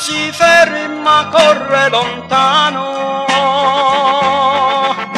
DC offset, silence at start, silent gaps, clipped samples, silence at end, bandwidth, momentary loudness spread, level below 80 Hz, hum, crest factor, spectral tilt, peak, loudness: under 0.1%; 0 s; none; under 0.1%; 0 s; 14 kHz; 7 LU; -52 dBFS; none; 12 dB; -2.5 dB/octave; 0 dBFS; -11 LUFS